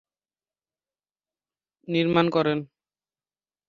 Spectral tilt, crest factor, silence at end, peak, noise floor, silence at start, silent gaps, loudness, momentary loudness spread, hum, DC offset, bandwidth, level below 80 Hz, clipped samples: -8 dB/octave; 24 dB; 1.05 s; -4 dBFS; under -90 dBFS; 1.9 s; none; -24 LUFS; 7 LU; 50 Hz at -55 dBFS; under 0.1%; 7.2 kHz; -68 dBFS; under 0.1%